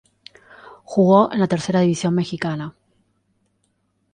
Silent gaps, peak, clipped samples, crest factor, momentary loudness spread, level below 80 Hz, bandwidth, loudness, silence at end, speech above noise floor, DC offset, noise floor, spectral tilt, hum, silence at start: none; -2 dBFS; under 0.1%; 20 dB; 12 LU; -60 dBFS; 9.8 kHz; -19 LUFS; 1.45 s; 50 dB; under 0.1%; -68 dBFS; -6.5 dB/octave; none; 0.65 s